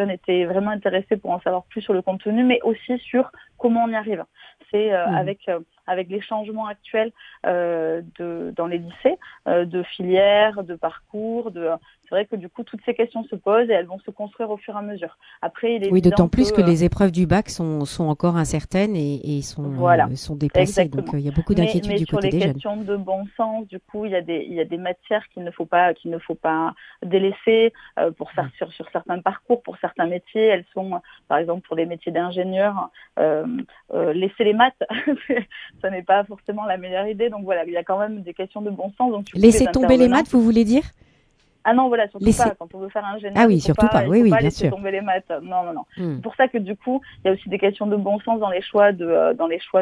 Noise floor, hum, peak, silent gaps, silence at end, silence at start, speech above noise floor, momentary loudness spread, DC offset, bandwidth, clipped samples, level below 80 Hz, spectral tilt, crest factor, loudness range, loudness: -60 dBFS; none; 0 dBFS; none; 0 s; 0 s; 40 dB; 13 LU; under 0.1%; 11 kHz; under 0.1%; -44 dBFS; -6.5 dB/octave; 20 dB; 6 LU; -21 LUFS